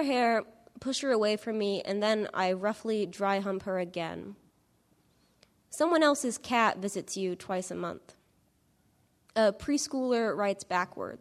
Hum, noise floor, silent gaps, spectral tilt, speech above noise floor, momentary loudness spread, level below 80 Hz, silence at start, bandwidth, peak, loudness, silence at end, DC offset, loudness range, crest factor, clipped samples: none; -69 dBFS; none; -4 dB/octave; 39 dB; 11 LU; -68 dBFS; 0 s; 14 kHz; -12 dBFS; -30 LUFS; 0.05 s; under 0.1%; 3 LU; 20 dB; under 0.1%